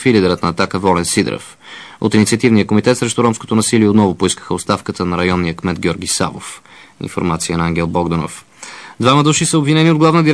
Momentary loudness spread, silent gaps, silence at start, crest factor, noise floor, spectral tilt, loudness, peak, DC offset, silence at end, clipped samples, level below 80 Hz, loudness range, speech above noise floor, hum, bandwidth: 18 LU; none; 0 s; 14 dB; -34 dBFS; -5 dB/octave; -14 LUFS; 0 dBFS; 0.2%; 0 s; under 0.1%; -42 dBFS; 5 LU; 20 dB; none; 11 kHz